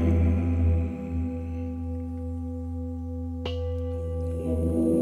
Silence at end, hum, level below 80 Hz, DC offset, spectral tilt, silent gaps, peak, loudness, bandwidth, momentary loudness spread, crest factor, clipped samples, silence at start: 0 s; none; -34 dBFS; under 0.1%; -9.5 dB/octave; none; -12 dBFS; -29 LUFS; 4.6 kHz; 10 LU; 14 dB; under 0.1%; 0 s